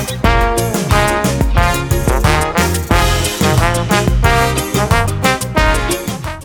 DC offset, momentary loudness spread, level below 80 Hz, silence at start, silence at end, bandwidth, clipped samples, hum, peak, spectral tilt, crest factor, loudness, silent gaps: under 0.1%; 3 LU; -20 dBFS; 0 s; 0 s; 19 kHz; under 0.1%; none; 0 dBFS; -4.5 dB/octave; 12 dB; -14 LUFS; none